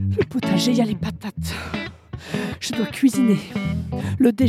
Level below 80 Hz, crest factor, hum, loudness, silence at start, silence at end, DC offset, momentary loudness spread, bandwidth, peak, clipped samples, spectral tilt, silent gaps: -44 dBFS; 16 dB; none; -22 LUFS; 0 s; 0 s; under 0.1%; 11 LU; 15 kHz; -4 dBFS; under 0.1%; -6 dB/octave; none